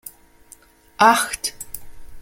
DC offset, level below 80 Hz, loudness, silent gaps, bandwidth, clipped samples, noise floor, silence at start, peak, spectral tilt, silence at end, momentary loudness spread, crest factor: under 0.1%; -48 dBFS; -18 LUFS; none; 17 kHz; under 0.1%; -50 dBFS; 0.05 s; 0 dBFS; -1.5 dB/octave; 0 s; 21 LU; 22 dB